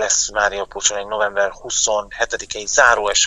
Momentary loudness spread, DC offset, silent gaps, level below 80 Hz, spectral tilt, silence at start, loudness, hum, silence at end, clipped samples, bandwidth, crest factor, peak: 9 LU; under 0.1%; none; -44 dBFS; 1 dB/octave; 0 s; -18 LUFS; none; 0 s; under 0.1%; 10.5 kHz; 18 dB; 0 dBFS